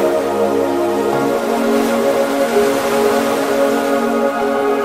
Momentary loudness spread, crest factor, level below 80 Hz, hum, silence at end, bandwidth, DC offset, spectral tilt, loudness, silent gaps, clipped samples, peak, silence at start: 2 LU; 12 dB; -52 dBFS; none; 0 s; 16 kHz; 0.2%; -4.5 dB/octave; -16 LUFS; none; under 0.1%; -2 dBFS; 0 s